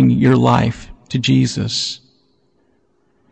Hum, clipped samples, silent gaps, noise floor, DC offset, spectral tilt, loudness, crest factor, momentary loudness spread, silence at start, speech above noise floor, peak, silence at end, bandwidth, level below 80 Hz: none; under 0.1%; none; -61 dBFS; under 0.1%; -6 dB/octave; -16 LUFS; 14 dB; 13 LU; 0 s; 46 dB; -2 dBFS; 1.35 s; 8.8 kHz; -44 dBFS